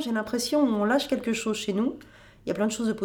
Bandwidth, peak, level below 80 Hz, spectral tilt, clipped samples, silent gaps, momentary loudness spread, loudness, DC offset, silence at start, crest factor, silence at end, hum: over 20 kHz; -10 dBFS; -60 dBFS; -4.5 dB/octave; under 0.1%; none; 9 LU; -26 LUFS; under 0.1%; 0 s; 16 dB; 0 s; none